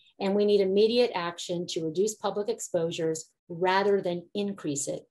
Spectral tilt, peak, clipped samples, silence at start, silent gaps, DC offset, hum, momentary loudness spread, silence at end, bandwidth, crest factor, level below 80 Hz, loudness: -4.5 dB/octave; -10 dBFS; under 0.1%; 0.2 s; 3.39-3.47 s; under 0.1%; none; 9 LU; 0.1 s; 12.5 kHz; 18 dB; -76 dBFS; -28 LUFS